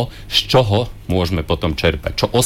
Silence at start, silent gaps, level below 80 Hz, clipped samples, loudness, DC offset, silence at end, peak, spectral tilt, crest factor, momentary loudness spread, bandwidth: 0 s; none; -30 dBFS; under 0.1%; -17 LUFS; under 0.1%; 0 s; -4 dBFS; -5 dB/octave; 14 dB; 6 LU; 17 kHz